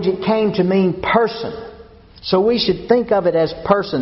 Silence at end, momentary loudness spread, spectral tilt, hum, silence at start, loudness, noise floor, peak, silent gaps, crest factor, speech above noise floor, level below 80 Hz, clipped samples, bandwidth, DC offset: 0 s; 13 LU; -4.5 dB/octave; none; 0 s; -17 LUFS; -42 dBFS; 0 dBFS; none; 16 dB; 25 dB; -46 dBFS; under 0.1%; 6 kHz; under 0.1%